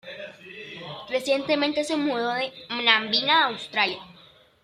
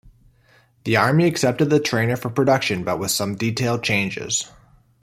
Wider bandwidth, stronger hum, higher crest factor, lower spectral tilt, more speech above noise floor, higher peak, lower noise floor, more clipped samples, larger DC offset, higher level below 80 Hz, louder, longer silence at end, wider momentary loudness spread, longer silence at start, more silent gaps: second, 14.5 kHz vs 16 kHz; neither; about the same, 22 dB vs 18 dB; second, -3 dB/octave vs -4.5 dB/octave; second, 30 dB vs 37 dB; about the same, -4 dBFS vs -2 dBFS; about the same, -54 dBFS vs -56 dBFS; neither; neither; second, -68 dBFS vs -56 dBFS; second, -23 LUFS vs -20 LUFS; about the same, 0.5 s vs 0.55 s; first, 19 LU vs 6 LU; second, 0.05 s vs 0.85 s; neither